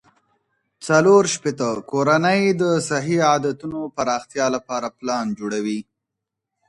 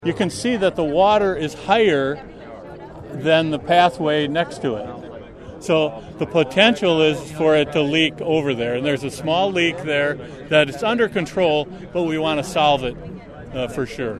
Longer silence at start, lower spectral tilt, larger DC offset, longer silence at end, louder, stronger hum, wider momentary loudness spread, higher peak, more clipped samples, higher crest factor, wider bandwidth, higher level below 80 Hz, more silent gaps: first, 0.8 s vs 0 s; about the same, -5 dB/octave vs -5 dB/octave; neither; first, 0.85 s vs 0 s; about the same, -20 LUFS vs -19 LUFS; neither; second, 12 LU vs 17 LU; about the same, -2 dBFS vs 0 dBFS; neither; about the same, 18 dB vs 20 dB; second, 11.5 kHz vs 13.5 kHz; second, -62 dBFS vs -48 dBFS; neither